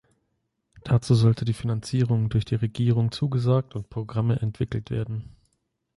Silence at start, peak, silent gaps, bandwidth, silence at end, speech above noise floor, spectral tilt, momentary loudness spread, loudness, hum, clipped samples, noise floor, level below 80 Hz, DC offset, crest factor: 0.75 s; -8 dBFS; none; 11.5 kHz; 0.7 s; 52 dB; -8 dB/octave; 11 LU; -25 LUFS; none; under 0.1%; -76 dBFS; -50 dBFS; under 0.1%; 16 dB